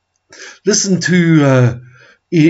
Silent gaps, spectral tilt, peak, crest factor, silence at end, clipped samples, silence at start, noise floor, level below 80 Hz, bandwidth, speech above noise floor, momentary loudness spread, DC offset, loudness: none; -5 dB/octave; 0 dBFS; 12 dB; 0 s; under 0.1%; 0.4 s; -38 dBFS; -58 dBFS; 8 kHz; 27 dB; 9 LU; under 0.1%; -12 LUFS